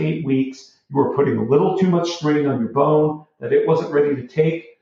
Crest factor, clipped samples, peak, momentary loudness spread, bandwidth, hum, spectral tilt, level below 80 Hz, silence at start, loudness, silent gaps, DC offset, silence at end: 14 dB; under 0.1%; -4 dBFS; 5 LU; 7.4 kHz; none; -7.5 dB/octave; -62 dBFS; 0 s; -19 LUFS; none; under 0.1%; 0.2 s